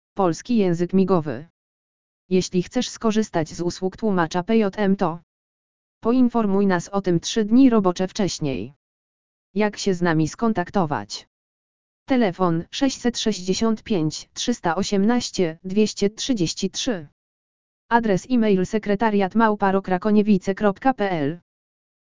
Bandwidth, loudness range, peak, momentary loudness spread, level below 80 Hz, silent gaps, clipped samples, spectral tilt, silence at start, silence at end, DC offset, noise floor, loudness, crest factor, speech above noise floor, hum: 7.6 kHz; 4 LU; -2 dBFS; 7 LU; -52 dBFS; 1.50-2.29 s, 5.23-6.01 s, 8.76-9.54 s, 11.27-12.06 s, 17.12-17.89 s; under 0.1%; -5.5 dB/octave; 0.15 s; 0.7 s; 1%; under -90 dBFS; -22 LUFS; 20 dB; over 69 dB; none